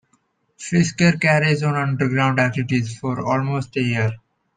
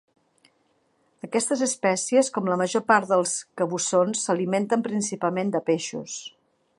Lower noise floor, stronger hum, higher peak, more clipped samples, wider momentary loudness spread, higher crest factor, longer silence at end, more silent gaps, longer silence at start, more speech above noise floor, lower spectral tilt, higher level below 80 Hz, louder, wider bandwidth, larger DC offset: about the same, -65 dBFS vs -67 dBFS; neither; about the same, -4 dBFS vs -4 dBFS; neither; about the same, 9 LU vs 10 LU; about the same, 16 dB vs 20 dB; about the same, 0.4 s vs 0.5 s; neither; second, 0.6 s vs 1.25 s; about the same, 46 dB vs 44 dB; first, -6 dB/octave vs -4 dB/octave; first, -56 dBFS vs -76 dBFS; first, -20 LUFS vs -24 LUFS; second, 9.6 kHz vs 11.5 kHz; neither